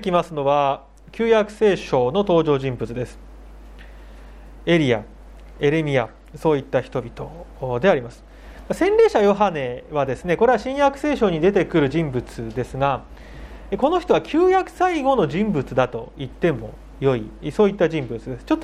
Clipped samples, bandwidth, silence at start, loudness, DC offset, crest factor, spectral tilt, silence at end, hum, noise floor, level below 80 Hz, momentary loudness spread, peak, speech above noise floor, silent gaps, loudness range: under 0.1%; 12 kHz; 0 s; -21 LUFS; under 0.1%; 18 dB; -7 dB/octave; 0 s; none; -40 dBFS; -42 dBFS; 13 LU; -2 dBFS; 21 dB; none; 4 LU